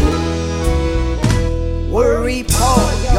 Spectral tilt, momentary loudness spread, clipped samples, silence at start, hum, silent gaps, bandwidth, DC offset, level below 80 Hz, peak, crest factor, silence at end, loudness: -5.5 dB/octave; 6 LU; under 0.1%; 0 s; none; none; 16.5 kHz; under 0.1%; -18 dBFS; 0 dBFS; 14 dB; 0 s; -16 LUFS